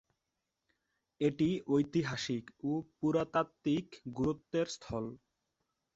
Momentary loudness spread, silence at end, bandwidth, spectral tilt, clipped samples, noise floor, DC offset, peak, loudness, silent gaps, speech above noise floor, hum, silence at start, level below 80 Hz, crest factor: 8 LU; 0.8 s; 8 kHz; -6 dB/octave; under 0.1%; -87 dBFS; under 0.1%; -18 dBFS; -35 LUFS; none; 53 dB; none; 1.2 s; -66 dBFS; 18 dB